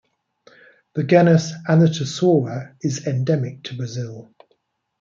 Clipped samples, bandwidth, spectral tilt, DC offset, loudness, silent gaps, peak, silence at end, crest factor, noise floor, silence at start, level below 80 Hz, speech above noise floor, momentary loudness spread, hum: under 0.1%; 7.6 kHz; -6.5 dB/octave; under 0.1%; -20 LUFS; none; -2 dBFS; 0.8 s; 18 dB; -67 dBFS; 0.95 s; -64 dBFS; 48 dB; 15 LU; none